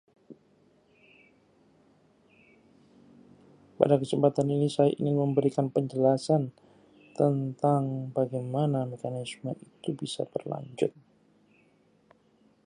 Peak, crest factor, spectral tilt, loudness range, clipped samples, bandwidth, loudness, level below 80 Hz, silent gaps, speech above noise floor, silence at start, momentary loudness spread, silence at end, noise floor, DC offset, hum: -4 dBFS; 26 dB; -7.5 dB/octave; 10 LU; under 0.1%; 10.5 kHz; -28 LUFS; -74 dBFS; none; 37 dB; 0.3 s; 12 LU; 1.75 s; -65 dBFS; under 0.1%; none